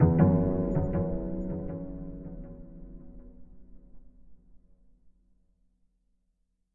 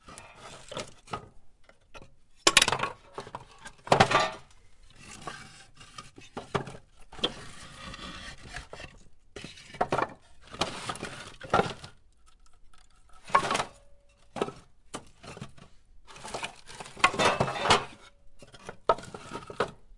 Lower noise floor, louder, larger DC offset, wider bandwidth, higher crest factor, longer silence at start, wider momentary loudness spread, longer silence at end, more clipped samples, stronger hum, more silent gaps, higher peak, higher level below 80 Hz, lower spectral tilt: first, -75 dBFS vs -56 dBFS; about the same, -29 LUFS vs -29 LUFS; neither; second, 2.6 kHz vs 11.5 kHz; second, 22 dB vs 32 dB; about the same, 0 s vs 0.05 s; first, 26 LU vs 23 LU; first, 2.2 s vs 0 s; neither; neither; neither; second, -10 dBFS vs 0 dBFS; first, -44 dBFS vs -54 dBFS; first, -13 dB/octave vs -2.5 dB/octave